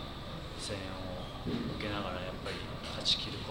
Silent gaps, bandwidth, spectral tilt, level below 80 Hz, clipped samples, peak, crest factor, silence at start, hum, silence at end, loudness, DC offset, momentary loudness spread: none; 17.5 kHz; -4 dB/octave; -48 dBFS; under 0.1%; -16 dBFS; 22 dB; 0 s; none; 0 s; -37 LUFS; under 0.1%; 11 LU